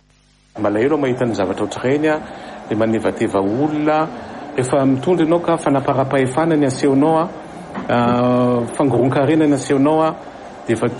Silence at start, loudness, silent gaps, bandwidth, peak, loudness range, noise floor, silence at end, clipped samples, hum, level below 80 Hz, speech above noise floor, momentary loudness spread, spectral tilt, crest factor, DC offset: 0.55 s; -17 LUFS; none; 11.5 kHz; -4 dBFS; 3 LU; -54 dBFS; 0 s; under 0.1%; none; -52 dBFS; 37 dB; 10 LU; -6.5 dB/octave; 12 dB; under 0.1%